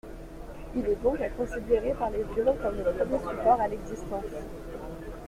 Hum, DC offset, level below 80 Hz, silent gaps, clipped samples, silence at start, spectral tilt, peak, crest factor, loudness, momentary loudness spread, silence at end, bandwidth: none; under 0.1%; -42 dBFS; none; under 0.1%; 0.05 s; -7 dB/octave; -10 dBFS; 18 dB; -29 LUFS; 15 LU; 0 s; 16 kHz